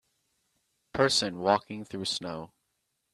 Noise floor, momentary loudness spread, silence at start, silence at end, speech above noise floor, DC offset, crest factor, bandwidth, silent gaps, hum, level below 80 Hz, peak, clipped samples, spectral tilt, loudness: -79 dBFS; 14 LU; 0.95 s; 0.65 s; 50 dB; under 0.1%; 24 dB; 13.5 kHz; none; none; -66 dBFS; -8 dBFS; under 0.1%; -3.5 dB/octave; -28 LUFS